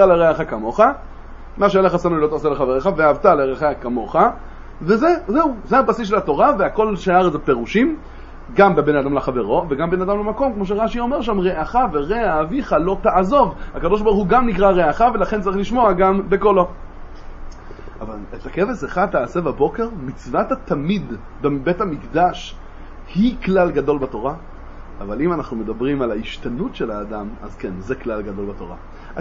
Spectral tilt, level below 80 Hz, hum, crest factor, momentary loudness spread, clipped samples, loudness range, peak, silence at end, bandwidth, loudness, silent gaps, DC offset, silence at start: -7.5 dB/octave; -34 dBFS; none; 18 dB; 15 LU; under 0.1%; 7 LU; 0 dBFS; 0 s; 7.4 kHz; -18 LUFS; none; under 0.1%; 0 s